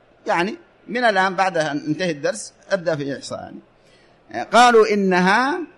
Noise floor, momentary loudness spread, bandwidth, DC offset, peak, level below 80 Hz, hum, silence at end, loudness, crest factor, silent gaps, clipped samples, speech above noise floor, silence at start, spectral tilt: -53 dBFS; 18 LU; 11.5 kHz; under 0.1%; -4 dBFS; -62 dBFS; none; 0.1 s; -18 LUFS; 16 dB; none; under 0.1%; 34 dB; 0.25 s; -4.5 dB/octave